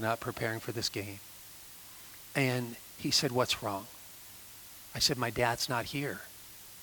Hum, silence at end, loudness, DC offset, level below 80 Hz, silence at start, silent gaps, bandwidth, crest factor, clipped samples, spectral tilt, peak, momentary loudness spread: none; 0 s; -32 LUFS; under 0.1%; -62 dBFS; 0 s; none; 19.5 kHz; 22 dB; under 0.1%; -3.5 dB/octave; -12 dBFS; 19 LU